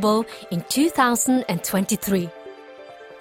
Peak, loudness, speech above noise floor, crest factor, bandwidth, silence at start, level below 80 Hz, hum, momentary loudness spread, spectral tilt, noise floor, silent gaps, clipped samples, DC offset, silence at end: -6 dBFS; -21 LUFS; 21 dB; 18 dB; 17 kHz; 0 s; -58 dBFS; none; 23 LU; -4 dB/octave; -42 dBFS; none; under 0.1%; under 0.1%; 0 s